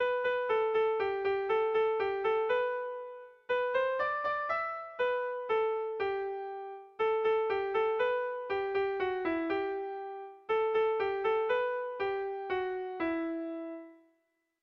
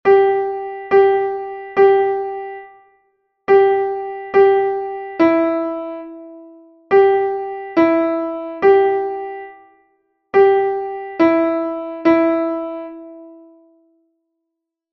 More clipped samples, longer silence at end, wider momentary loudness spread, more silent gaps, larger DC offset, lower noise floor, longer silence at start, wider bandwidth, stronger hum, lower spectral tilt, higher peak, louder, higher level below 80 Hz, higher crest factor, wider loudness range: neither; second, 0.7 s vs 1.6 s; second, 10 LU vs 17 LU; neither; neither; about the same, -78 dBFS vs -79 dBFS; about the same, 0 s vs 0.05 s; about the same, 6 kHz vs 5.8 kHz; neither; second, -6 dB/octave vs -7.5 dB/octave; second, -20 dBFS vs -2 dBFS; second, -32 LUFS vs -16 LUFS; second, -70 dBFS vs -58 dBFS; about the same, 12 dB vs 16 dB; about the same, 2 LU vs 3 LU